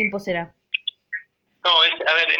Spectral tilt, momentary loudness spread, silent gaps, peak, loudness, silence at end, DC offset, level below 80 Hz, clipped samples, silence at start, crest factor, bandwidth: -3.5 dB/octave; 18 LU; none; -6 dBFS; -20 LUFS; 0 s; under 0.1%; -62 dBFS; under 0.1%; 0 s; 18 dB; 17.5 kHz